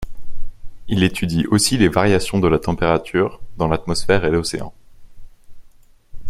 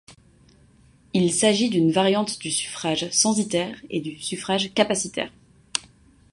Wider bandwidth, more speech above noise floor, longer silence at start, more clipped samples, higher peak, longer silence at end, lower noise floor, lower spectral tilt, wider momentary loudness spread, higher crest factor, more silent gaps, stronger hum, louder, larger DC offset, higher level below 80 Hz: first, 14 kHz vs 11.5 kHz; second, 29 dB vs 33 dB; about the same, 0 s vs 0.1 s; neither; about the same, 0 dBFS vs -2 dBFS; second, 0 s vs 0.55 s; second, -46 dBFS vs -55 dBFS; first, -5 dB/octave vs -3.5 dB/octave; about the same, 9 LU vs 11 LU; about the same, 18 dB vs 22 dB; neither; neither; first, -18 LUFS vs -23 LUFS; neither; first, -34 dBFS vs -60 dBFS